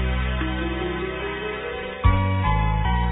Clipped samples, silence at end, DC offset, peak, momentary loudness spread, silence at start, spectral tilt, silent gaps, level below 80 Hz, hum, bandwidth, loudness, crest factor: under 0.1%; 0 s; under 0.1%; -6 dBFS; 7 LU; 0 s; -10.5 dB/octave; none; -26 dBFS; none; 4 kHz; -24 LUFS; 18 dB